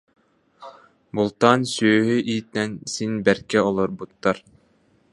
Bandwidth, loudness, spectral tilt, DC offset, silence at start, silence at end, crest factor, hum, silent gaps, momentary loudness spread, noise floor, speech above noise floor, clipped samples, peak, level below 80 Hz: 11.5 kHz; -22 LUFS; -5 dB/octave; under 0.1%; 0.6 s; 0.75 s; 22 dB; none; none; 9 LU; -61 dBFS; 40 dB; under 0.1%; 0 dBFS; -58 dBFS